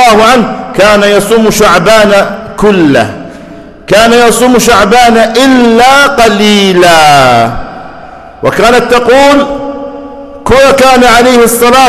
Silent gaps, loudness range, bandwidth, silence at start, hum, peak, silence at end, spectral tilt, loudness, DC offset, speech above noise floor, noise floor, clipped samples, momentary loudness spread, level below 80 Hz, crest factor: none; 3 LU; 14 kHz; 0 s; none; 0 dBFS; 0 s; -4 dB/octave; -4 LUFS; under 0.1%; 24 dB; -27 dBFS; 2%; 14 LU; -28 dBFS; 4 dB